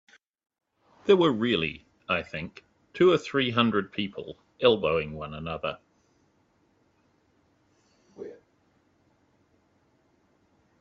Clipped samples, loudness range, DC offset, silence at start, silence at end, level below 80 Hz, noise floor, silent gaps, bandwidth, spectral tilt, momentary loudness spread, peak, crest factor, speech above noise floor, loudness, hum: under 0.1%; 15 LU; under 0.1%; 1.05 s; 2.45 s; -62 dBFS; -68 dBFS; none; 7.6 kHz; -6.5 dB/octave; 22 LU; -6 dBFS; 24 dB; 42 dB; -26 LUFS; none